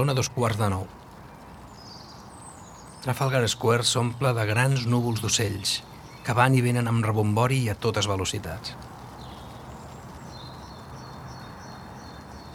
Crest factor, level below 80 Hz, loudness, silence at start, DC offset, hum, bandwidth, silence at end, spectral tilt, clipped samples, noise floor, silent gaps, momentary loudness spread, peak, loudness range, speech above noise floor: 24 dB; -52 dBFS; -25 LUFS; 0 s; under 0.1%; none; 16 kHz; 0 s; -4.5 dB/octave; under 0.1%; -45 dBFS; none; 21 LU; -4 dBFS; 16 LU; 21 dB